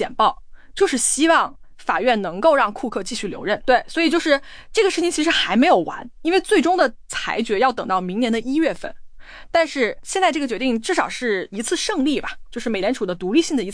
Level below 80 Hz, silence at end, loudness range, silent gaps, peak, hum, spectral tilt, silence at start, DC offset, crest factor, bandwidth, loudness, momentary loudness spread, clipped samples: -46 dBFS; 0 s; 3 LU; none; -4 dBFS; none; -3 dB/octave; 0 s; under 0.1%; 16 dB; 10.5 kHz; -20 LUFS; 9 LU; under 0.1%